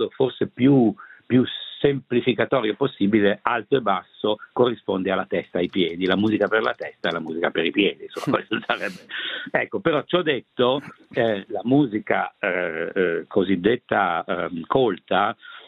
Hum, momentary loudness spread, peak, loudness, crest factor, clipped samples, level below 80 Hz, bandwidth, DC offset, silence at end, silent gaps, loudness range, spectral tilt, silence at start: none; 6 LU; -2 dBFS; -23 LUFS; 20 dB; under 0.1%; -62 dBFS; 10.5 kHz; under 0.1%; 0.1 s; none; 2 LU; -7.5 dB/octave; 0 s